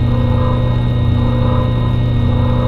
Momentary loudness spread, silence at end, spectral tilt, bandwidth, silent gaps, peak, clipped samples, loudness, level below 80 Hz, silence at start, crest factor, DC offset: 1 LU; 0 s; -9.5 dB/octave; 4.5 kHz; none; -2 dBFS; under 0.1%; -15 LUFS; -22 dBFS; 0 s; 10 dB; under 0.1%